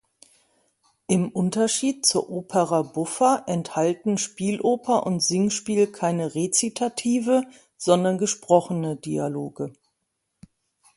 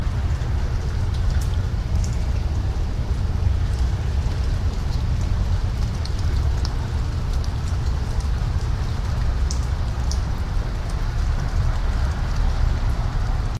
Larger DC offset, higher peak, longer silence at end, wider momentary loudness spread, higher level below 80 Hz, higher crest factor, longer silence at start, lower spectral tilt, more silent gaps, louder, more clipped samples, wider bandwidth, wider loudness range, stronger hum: neither; about the same, -4 dBFS vs -6 dBFS; first, 1.25 s vs 0 s; first, 8 LU vs 2 LU; second, -66 dBFS vs -22 dBFS; first, 20 dB vs 14 dB; first, 1.1 s vs 0 s; second, -4.5 dB/octave vs -6 dB/octave; neither; about the same, -23 LUFS vs -25 LUFS; neither; about the same, 11.5 kHz vs 11.5 kHz; about the same, 2 LU vs 1 LU; neither